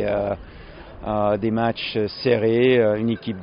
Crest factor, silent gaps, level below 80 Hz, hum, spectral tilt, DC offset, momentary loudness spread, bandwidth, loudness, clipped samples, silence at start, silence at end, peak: 16 dB; none; -46 dBFS; none; -5 dB/octave; under 0.1%; 15 LU; 5.4 kHz; -21 LUFS; under 0.1%; 0 s; 0 s; -4 dBFS